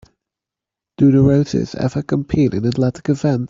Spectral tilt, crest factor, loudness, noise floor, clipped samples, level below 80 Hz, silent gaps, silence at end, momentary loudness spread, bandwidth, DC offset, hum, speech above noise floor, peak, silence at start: -8.5 dB/octave; 14 dB; -17 LUFS; -86 dBFS; under 0.1%; -44 dBFS; none; 0 s; 8 LU; 7.6 kHz; under 0.1%; none; 70 dB; -2 dBFS; 1 s